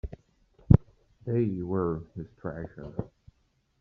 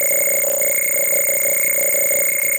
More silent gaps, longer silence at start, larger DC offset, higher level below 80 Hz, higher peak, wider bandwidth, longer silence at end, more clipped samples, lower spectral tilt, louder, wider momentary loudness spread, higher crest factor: neither; about the same, 0.05 s vs 0 s; neither; first, -42 dBFS vs -58 dBFS; about the same, -4 dBFS vs -6 dBFS; second, 3.4 kHz vs 17 kHz; first, 0.75 s vs 0 s; neither; first, -11.5 dB/octave vs 0 dB/octave; second, -29 LUFS vs -14 LUFS; first, 20 LU vs 1 LU; first, 26 dB vs 10 dB